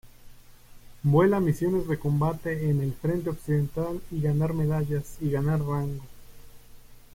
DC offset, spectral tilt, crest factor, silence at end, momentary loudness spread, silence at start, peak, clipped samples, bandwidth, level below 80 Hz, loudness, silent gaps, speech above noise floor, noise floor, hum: under 0.1%; -8.5 dB/octave; 18 dB; 0.15 s; 8 LU; 0.05 s; -10 dBFS; under 0.1%; 16.5 kHz; -46 dBFS; -27 LUFS; none; 23 dB; -48 dBFS; 60 Hz at -50 dBFS